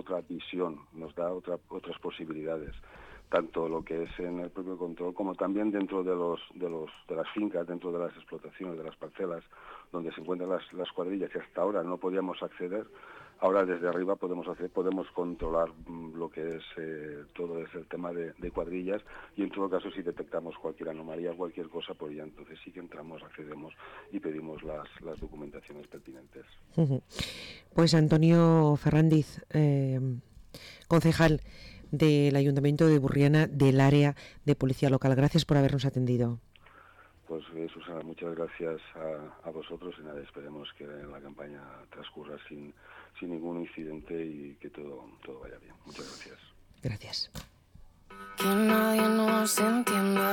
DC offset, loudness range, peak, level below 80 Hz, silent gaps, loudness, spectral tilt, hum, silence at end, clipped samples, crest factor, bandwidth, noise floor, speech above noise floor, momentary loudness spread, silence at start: under 0.1%; 17 LU; -14 dBFS; -56 dBFS; none; -30 LUFS; -6.5 dB/octave; none; 0 s; under 0.1%; 16 dB; 17.5 kHz; -57 dBFS; 27 dB; 22 LU; 0.05 s